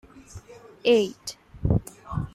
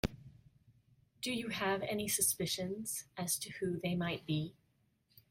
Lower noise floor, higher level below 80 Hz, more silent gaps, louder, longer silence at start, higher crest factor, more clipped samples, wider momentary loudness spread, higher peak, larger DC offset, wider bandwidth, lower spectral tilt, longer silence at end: second, -45 dBFS vs -76 dBFS; first, -40 dBFS vs -60 dBFS; neither; first, -25 LUFS vs -37 LUFS; about the same, 0.15 s vs 0.05 s; second, 18 dB vs 24 dB; neither; first, 24 LU vs 9 LU; first, -8 dBFS vs -14 dBFS; neither; about the same, 15.5 kHz vs 16.5 kHz; first, -6 dB/octave vs -3.5 dB/octave; second, 0.05 s vs 0.8 s